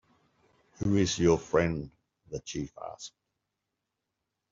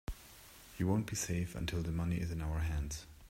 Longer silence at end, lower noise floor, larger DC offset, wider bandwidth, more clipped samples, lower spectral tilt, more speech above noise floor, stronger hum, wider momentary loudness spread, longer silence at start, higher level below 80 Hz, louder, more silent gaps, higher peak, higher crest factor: first, 1.45 s vs 0 s; first, -85 dBFS vs -57 dBFS; neither; second, 7.8 kHz vs 16 kHz; neither; about the same, -5.5 dB/octave vs -5.5 dB/octave; first, 56 dB vs 20 dB; neither; about the same, 19 LU vs 17 LU; first, 0.8 s vs 0.1 s; second, -56 dBFS vs -46 dBFS; first, -29 LUFS vs -38 LUFS; neither; first, -12 dBFS vs -20 dBFS; about the same, 22 dB vs 18 dB